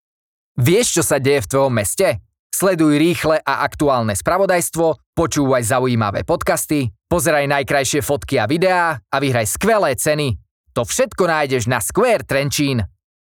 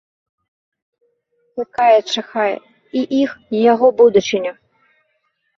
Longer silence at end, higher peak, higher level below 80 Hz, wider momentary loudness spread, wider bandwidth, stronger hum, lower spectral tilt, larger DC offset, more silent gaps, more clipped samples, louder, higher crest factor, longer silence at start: second, 0.35 s vs 1.05 s; about the same, -2 dBFS vs -2 dBFS; first, -42 dBFS vs -62 dBFS; second, 5 LU vs 15 LU; first, 20 kHz vs 7.6 kHz; neither; about the same, -4.5 dB/octave vs -4.5 dB/octave; neither; first, 2.39-2.50 s, 5.06-5.13 s, 10.51-10.64 s vs none; neither; about the same, -17 LUFS vs -16 LUFS; about the same, 16 dB vs 16 dB; second, 0.55 s vs 1.55 s